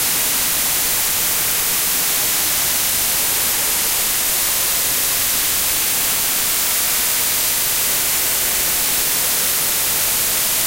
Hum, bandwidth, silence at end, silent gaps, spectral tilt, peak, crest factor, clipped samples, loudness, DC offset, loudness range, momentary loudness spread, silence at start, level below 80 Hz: none; 16.5 kHz; 0 s; none; 0.5 dB/octave; -4 dBFS; 14 dB; under 0.1%; -15 LUFS; under 0.1%; 0 LU; 0 LU; 0 s; -44 dBFS